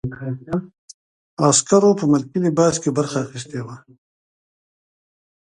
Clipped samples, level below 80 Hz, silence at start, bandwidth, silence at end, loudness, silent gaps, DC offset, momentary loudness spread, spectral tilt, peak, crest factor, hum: under 0.1%; -56 dBFS; 0.05 s; 11.5 kHz; 1.8 s; -18 LUFS; 0.78-0.88 s, 0.94-1.37 s; under 0.1%; 16 LU; -5 dB/octave; 0 dBFS; 20 dB; none